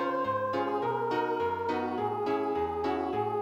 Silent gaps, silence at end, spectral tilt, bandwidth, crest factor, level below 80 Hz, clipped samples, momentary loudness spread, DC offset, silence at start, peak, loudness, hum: none; 0 s; -7 dB/octave; 14 kHz; 12 dB; -64 dBFS; under 0.1%; 1 LU; under 0.1%; 0 s; -18 dBFS; -31 LUFS; none